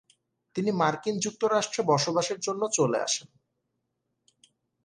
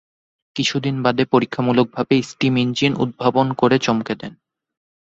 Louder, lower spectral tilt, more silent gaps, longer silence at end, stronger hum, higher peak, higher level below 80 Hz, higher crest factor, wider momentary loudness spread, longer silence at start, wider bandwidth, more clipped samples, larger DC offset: second, -27 LUFS vs -19 LUFS; second, -3.5 dB/octave vs -5.5 dB/octave; neither; first, 1.65 s vs 0.75 s; neither; second, -10 dBFS vs -2 dBFS; second, -74 dBFS vs -56 dBFS; about the same, 20 dB vs 18 dB; about the same, 5 LU vs 6 LU; about the same, 0.55 s vs 0.55 s; first, 10.5 kHz vs 8 kHz; neither; neither